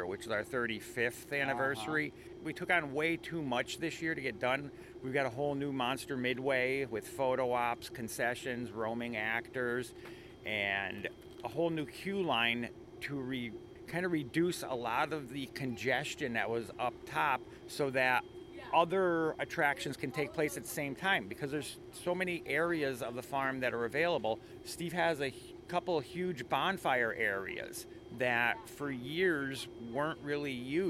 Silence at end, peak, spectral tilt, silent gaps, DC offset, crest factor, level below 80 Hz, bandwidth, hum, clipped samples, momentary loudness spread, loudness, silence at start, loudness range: 0 s; -16 dBFS; -4.5 dB/octave; none; under 0.1%; 20 dB; -66 dBFS; 16.5 kHz; none; under 0.1%; 10 LU; -35 LUFS; 0 s; 3 LU